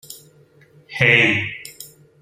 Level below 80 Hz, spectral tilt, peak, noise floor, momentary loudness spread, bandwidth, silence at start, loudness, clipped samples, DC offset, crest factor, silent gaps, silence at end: -58 dBFS; -4.5 dB/octave; 0 dBFS; -52 dBFS; 26 LU; 16 kHz; 0.1 s; -15 LUFS; under 0.1%; under 0.1%; 20 dB; none; 0.35 s